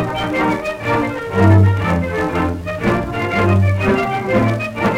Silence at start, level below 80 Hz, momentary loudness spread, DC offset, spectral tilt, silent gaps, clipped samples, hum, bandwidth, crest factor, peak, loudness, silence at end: 0 s; -36 dBFS; 7 LU; under 0.1%; -7.5 dB/octave; none; under 0.1%; none; 11 kHz; 14 dB; 0 dBFS; -16 LUFS; 0 s